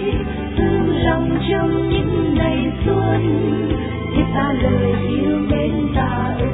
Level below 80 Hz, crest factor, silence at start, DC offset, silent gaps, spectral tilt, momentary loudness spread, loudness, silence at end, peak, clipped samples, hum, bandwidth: -28 dBFS; 14 dB; 0 s; under 0.1%; none; -11.5 dB/octave; 3 LU; -18 LUFS; 0 s; -2 dBFS; under 0.1%; none; 4 kHz